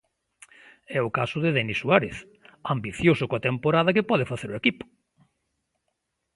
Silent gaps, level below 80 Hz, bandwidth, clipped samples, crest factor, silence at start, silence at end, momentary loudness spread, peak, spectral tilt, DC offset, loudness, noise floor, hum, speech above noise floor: none; -56 dBFS; 11.5 kHz; under 0.1%; 24 dB; 0.9 s; 1.5 s; 13 LU; -2 dBFS; -6.5 dB/octave; under 0.1%; -24 LUFS; -78 dBFS; none; 54 dB